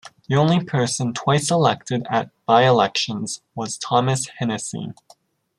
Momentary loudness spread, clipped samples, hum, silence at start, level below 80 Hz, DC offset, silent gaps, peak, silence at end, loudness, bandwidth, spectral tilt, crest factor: 13 LU; under 0.1%; none; 0.05 s; -62 dBFS; under 0.1%; none; -2 dBFS; 0.65 s; -20 LUFS; 13 kHz; -5 dB/octave; 18 dB